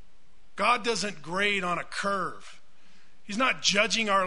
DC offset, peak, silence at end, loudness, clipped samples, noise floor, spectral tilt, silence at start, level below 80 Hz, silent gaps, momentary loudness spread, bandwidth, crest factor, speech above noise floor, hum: 1%; -8 dBFS; 0 s; -27 LUFS; under 0.1%; -62 dBFS; -2.5 dB/octave; 0.55 s; -62 dBFS; none; 13 LU; 11 kHz; 20 dB; 34 dB; none